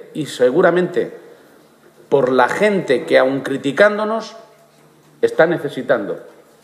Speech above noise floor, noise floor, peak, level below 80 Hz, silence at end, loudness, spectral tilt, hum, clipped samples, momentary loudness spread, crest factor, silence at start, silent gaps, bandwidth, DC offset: 34 dB; -50 dBFS; 0 dBFS; -68 dBFS; 0.35 s; -16 LUFS; -5.5 dB/octave; none; under 0.1%; 11 LU; 18 dB; 0.15 s; none; 14 kHz; under 0.1%